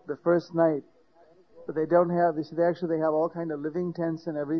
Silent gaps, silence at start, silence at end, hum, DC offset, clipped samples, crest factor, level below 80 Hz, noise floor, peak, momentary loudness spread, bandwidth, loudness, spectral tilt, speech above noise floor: none; 0.05 s; 0 s; none; under 0.1%; under 0.1%; 18 dB; -68 dBFS; -59 dBFS; -10 dBFS; 9 LU; 6.2 kHz; -27 LUFS; -9.5 dB/octave; 33 dB